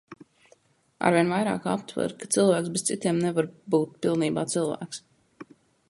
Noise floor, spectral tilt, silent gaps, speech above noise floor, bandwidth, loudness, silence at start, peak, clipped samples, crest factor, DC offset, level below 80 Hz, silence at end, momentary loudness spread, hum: -62 dBFS; -5 dB/octave; none; 37 dB; 11.5 kHz; -26 LUFS; 0.1 s; -6 dBFS; under 0.1%; 22 dB; under 0.1%; -68 dBFS; 0.45 s; 9 LU; none